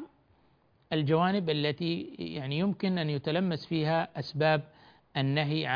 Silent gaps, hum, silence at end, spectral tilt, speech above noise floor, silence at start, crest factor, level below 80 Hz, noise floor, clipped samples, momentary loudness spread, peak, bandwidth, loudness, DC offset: none; none; 0 s; -8.5 dB/octave; 37 dB; 0 s; 20 dB; -66 dBFS; -66 dBFS; under 0.1%; 9 LU; -12 dBFS; 5.2 kHz; -30 LUFS; under 0.1%